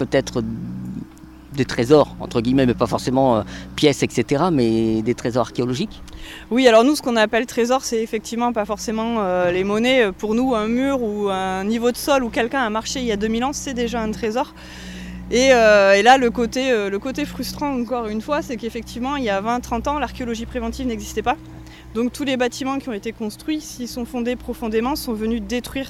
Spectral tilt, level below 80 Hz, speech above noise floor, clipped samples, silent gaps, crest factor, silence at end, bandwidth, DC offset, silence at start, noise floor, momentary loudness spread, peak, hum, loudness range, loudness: -5 dB/octave; -42 dBFS; 21 dB; under 0.1%; none; 18 dB; 0 s; 16 kHz; under 0.1%; 0 s; -41 dBFS; 13 LU; -2 dBFS; none; 8 LU; -20 LUFS